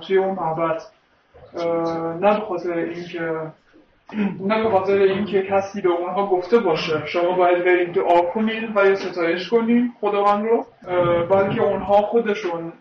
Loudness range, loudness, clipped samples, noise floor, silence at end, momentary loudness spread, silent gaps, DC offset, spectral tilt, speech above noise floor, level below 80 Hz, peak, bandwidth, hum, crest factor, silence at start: 5 LU; -20 LUFS; under 0.1%; -50 dBFS; 0.05 s; 8 LU; none; under 0.1%; -7 dB/octave; 30 dB; -56 dBFS; -6 dBFS; 6.6 kHz; none; 14 dB; 0 s